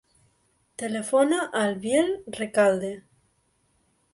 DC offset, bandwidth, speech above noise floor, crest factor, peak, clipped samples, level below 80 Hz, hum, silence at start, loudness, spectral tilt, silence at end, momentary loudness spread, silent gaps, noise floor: under 0.1%; 11.5 kHz; 45 dB; 20 dB; -8 dBFS; under 0.1%; -66 dBFS; none; 0.8 s; -25 LUFS; -4.5 dB/octave; 1.15 s; 13 LU; none; -69 dBFS